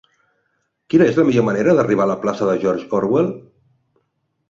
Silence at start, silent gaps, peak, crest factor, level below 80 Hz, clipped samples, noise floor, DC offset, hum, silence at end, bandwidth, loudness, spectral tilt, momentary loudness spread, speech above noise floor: 0.9 s; none; -2 dBFS; 16 dB; -58 dBFS; under 0.1%; -70 dBFS; under 0.1%; none; 1.1 s; 7.6 kHz; -17 LUFS; -7.5 dB/octave; 6 LU; 54 dB